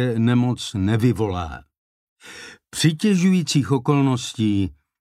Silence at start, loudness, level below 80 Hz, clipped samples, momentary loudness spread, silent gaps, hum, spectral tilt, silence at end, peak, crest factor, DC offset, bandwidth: 0 s; -20 LUFS; -48 dBFS; under 0.1%; 19 LU; 1.78-2.16 s; none; -6 dB/octave; 0.3 s; -4 dBFS; 16 dB; under 0.1%; 15 kHz